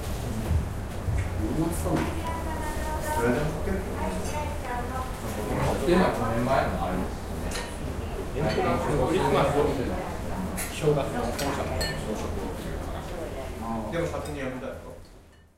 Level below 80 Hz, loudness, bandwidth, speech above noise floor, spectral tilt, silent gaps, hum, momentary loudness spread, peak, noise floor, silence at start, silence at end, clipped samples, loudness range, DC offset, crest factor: -36 dBFS; -29 LUFS; 16 kHz; 25 dB; -6 dB/octave; none; none; 10 LU; -10 dBFS; -51 dBFS; 0 s; 0.25 s; under 0.1%; 5 LU; under 0.1%; 18 dB